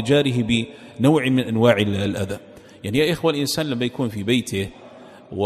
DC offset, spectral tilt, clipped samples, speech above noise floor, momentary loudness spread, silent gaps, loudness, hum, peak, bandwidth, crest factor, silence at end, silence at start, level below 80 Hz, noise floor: under 0.1%; -5.5 dB/octave; under 0.1%; 23 dB; 13 LU; none; -21 LUFS; none; -2 dBFS; 14.5 kHz; 20 dB; 0 s; 0 s; -52 dBFS; -43 dBFS